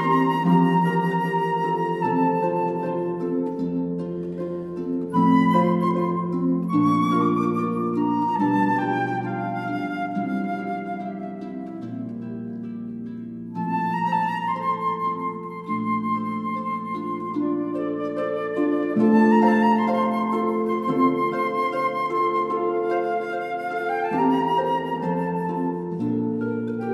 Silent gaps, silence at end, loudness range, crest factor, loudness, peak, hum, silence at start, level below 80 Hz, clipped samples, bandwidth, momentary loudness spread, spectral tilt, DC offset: none; 0 s; 7 LU; 16 dB; -23 LUFS; -6 dBFS; none; 0 s; -66 dBFS; under 0.1%; 12 kHz; 11 LU; -8.5 dB/octave; under 0.1%